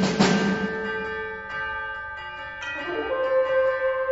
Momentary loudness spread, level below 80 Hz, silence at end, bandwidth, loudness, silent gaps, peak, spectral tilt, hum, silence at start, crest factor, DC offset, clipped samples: 12 LU; -52 dBFS; 0 s; 8 kHz; -26 LUFS; none; -6 dBFS; -5 dB/octave; none; 0 s; 18 dB; under 0.1%; under 0.1%